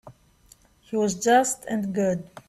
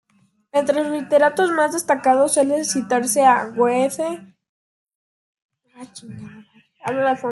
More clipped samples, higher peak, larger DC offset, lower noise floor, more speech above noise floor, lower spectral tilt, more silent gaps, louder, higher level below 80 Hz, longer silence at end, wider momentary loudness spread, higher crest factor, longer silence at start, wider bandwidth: neither; second, -8 dBFS vs -4 dBFS; neither; second, -57 dBFS vs -62 dBFS; second, 34 dB vs 43 dB; about the same, -4.5 dB/octave vs -3.5 dB/octave; second, none vs 4.49-4.87 s, 4.95-5.33 s, 5.42-5.49 s; second, -24 LUFS vs -18 LUFS; first, -60 dBFS vs -70 dBFS; about the same, 0.1 s vs 0 s; second, 8 LU vs 21 LU; about the same, 18 dB vs 16 dB; second, 0.05 s vs 0.55 s; first, 14 kHz vs 12.5 kHz